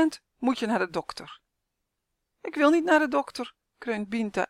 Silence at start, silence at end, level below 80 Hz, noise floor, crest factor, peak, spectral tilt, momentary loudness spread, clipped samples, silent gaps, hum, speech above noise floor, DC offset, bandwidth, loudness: 0 s; 0.05 s; -66 dBFS; -82 dBFS; 20 dB; -8 dBFS; -5 dB/octave; 18 LU; under 0.1%; none; none; 56 dB; under 0.1%; 13.5 kHz; -26 LUFS